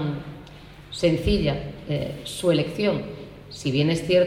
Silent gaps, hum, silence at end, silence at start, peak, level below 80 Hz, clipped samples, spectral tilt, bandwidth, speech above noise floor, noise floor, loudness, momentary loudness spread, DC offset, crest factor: none; none; 0 s; 0 s; -8 dBFS; -40 dBFS; under 0.1%; -6 dB/octave; 15 kHz; 21 dB; -44 dBFS; -25 LUFS; 18 LU; under 0.1%; 16 dB